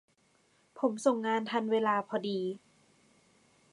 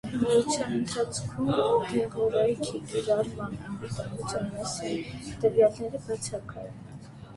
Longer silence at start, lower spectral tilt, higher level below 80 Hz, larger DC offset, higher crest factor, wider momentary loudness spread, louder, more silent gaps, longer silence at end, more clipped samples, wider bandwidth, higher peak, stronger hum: first, 0.75 s vs 0.05 s; about the same, -5 dB/octave vs -5 dB/octave; second, -86 dBFS vs -54 dBFS; neither; first, 22 dB vs 16 dB; second, 7 LU vs 14 LU; second, -32 LUFS vs -29 LUFS; neither; first, 1.15 s vs 0 s; neither; about the same, 11.5 kHz vs 11.5 kHz; about the same, -12 dBFS vs -12 dBFS; neither